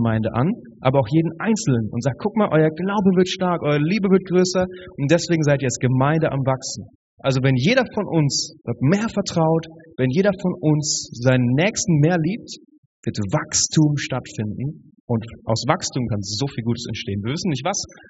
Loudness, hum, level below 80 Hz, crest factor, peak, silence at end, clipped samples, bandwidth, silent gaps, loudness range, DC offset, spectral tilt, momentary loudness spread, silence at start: -20 LUFS; none; -52 dBFS; 18 dB; -2 dBFS; 0.15 s; under 0.1%; 8 kHz; 6.95-7.17 s, 12.78-13.03 s, 15.00-15.08 s; 4 LU; under 0.1%; -6 dB/octave; 9 LU; 0 s